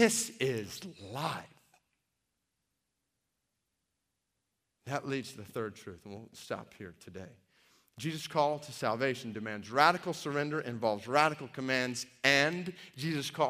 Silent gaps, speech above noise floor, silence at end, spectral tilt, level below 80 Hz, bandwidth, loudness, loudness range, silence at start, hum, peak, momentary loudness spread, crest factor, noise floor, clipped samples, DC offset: none; 51 dB; 0 s; -3.5 dB/octave; -76 dBFS; 15.5 kHz; -33 LUFS; 14 LU; 0 s; none; -6 dBFS; 21 LU; 28 dB; -84 dBFS; under 0.1%; under 0.1%